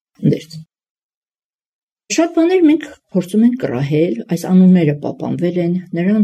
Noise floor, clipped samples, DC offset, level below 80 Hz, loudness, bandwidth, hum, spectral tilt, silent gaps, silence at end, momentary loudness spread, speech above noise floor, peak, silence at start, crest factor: under -90 dBFS; under 0.1%; under 0.1%; -60 dBFS; -15 LUFS; 13.5 kHz; none; -7 dB/octave; 0.90-0.96 s, 1.03-1.22 s, 1.44-1.59 s, 1.66-1.96 s; 0 s; 10 LU; over 76 dB; -2 dBFS; 0.2 s; 14 dB